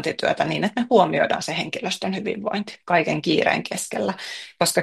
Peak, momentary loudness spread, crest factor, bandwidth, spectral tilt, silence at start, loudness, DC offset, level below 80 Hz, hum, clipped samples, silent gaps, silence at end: -2 dBFS; 9 LU; 20 dB; 12.5 kHz; -4 dB/octave; 0 s; -22 LUFS; under 0.1%; -64 dBFS; none; under 0.1%; none; 0 s